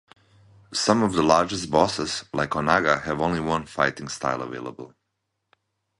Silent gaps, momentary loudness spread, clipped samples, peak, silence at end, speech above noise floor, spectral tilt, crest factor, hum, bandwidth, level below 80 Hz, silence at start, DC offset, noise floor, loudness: none; 11 LU; under 0.1%; -2 dBFS; 1.15 s; 55 dB; -4.5 dB/octave; 22 dB; none; 11.5 kHz; -52 dBFS; 0.7 s; under 0.1%; -79 dBFS; -23 LUFS